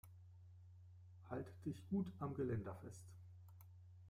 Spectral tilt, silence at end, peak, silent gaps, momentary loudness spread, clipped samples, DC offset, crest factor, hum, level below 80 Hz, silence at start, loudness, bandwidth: -8.5 dB/octave; 0 s; -32 dBFS; none; 19 LU; under 0.1%; under 0.1%; 18 dB; none; -76 dBFS; 0.05 s; -47 LUFS; 15.5 kHz